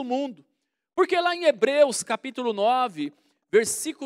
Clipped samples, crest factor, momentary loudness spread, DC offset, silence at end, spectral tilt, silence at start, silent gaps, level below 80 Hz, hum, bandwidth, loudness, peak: under 0.1%; 18 dB; 12 LU; under 0.1%; 0 s; -2.5 dB/octave; 0 s; none; -76 dBFS; none; 16 kHz; -24 LUFS; -8 dBFS